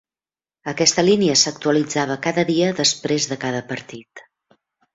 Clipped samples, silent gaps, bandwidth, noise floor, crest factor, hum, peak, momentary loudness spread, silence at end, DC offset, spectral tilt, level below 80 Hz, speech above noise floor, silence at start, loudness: under 0.1%; none; 8 kHz; under -90 dBFS; 20 dB; none; -2 dBFS; 16 LU; 0.75 s; under 0.1%; -3 dB/octave; -62 dBFS; over 71 dB; 0.65 s; -18 LUFS